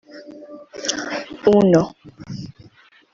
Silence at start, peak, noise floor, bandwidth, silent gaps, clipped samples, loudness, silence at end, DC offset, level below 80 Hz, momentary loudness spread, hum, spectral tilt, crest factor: 0.15 s; -2 dBFS; -51 dBFS; 7.8 kHz; none; under 0.1%; -18 LUFS; 0.6 s; under 0.1%; -56 dBFS; 25 LU; none; -5.5 dB/octave; 20 dB